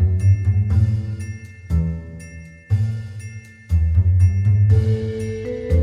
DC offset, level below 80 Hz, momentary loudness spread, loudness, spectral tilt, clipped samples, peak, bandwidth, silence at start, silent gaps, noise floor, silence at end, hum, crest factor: under 0.1%; -28 dBFS; 20 LU; -19 LUFS; -9 dB/octave; under 0.1%; -6 dBFS; 9.6 kHz; 0 s; none; -38 dBFS; 0 s; none; 12 dB